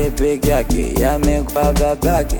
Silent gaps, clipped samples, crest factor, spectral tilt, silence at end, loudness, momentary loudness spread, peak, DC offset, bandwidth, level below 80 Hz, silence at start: none; under 0.1%; 10 dB; -6 dB/octave; 0 s; -17 LUFS; 2 LU; -4 dBFS; under 0.1%; 19.5 kHz; -20 dBFS; 0 s